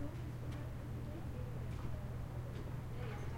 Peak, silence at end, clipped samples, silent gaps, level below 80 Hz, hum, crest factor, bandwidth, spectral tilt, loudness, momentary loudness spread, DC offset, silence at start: -30 dBFS; 0 s; under 0.1%; none; -52 dBFS; none; 14 dB; 16.5 kHz; -7.5 dB/octave; -46 LUFS; 1 LU; under 0.1%; 0 s